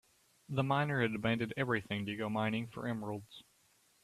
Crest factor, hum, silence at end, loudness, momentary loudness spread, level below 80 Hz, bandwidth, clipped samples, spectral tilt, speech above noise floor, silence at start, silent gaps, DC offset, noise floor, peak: 20 dB; none; 0.6 s; -36 LUFS; 11 LU; -70 dBFS; 14 kHz; under 0.1%; -7 dB/octave; 35 dB; 0.5 s; none; under 0.1%; -71 dBFS; -18 dBFS